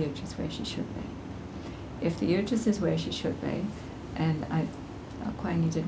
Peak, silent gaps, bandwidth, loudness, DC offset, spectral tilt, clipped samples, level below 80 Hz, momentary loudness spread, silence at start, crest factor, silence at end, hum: -14 dBFS; none; 8 kHz; -32 LUFS; under 0.1%; -6.5 dB/octave; under 0.1%; -48 dBFS; 13 LU; 0 s; 18 dB; 0 s; none